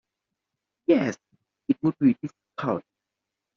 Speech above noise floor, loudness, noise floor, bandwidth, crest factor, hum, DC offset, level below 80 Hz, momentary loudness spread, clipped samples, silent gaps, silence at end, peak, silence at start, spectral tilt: 63 dB; -26 LUFS; -86 dBFS; 7.2 kHz; 20 dB; none; under 0.1%; -70 dBFS; 14 LU; under 0.1%; none; 0.75 s; -8 dBFS; 0.9 s; -7 dB/octave